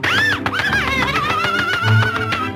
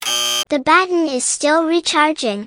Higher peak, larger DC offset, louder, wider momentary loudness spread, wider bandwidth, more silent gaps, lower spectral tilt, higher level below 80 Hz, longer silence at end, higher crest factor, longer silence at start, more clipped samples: second, -4 dBFS vs 0 dBFS; neither; about the same, -16 LUFS vs -15 LUFS; about the same, 3 LU vs 4 LU; second, 16 kHz vs over 20 kHz; neither; first, -4.5 dB/octave vs -1 dB/octave; first, -38 dBFS vs -60 dBFS; about the same, 0 s vs 0 s; about the same, 14 dB vs 16 dB; about the same, 0 s vs 0 s; neither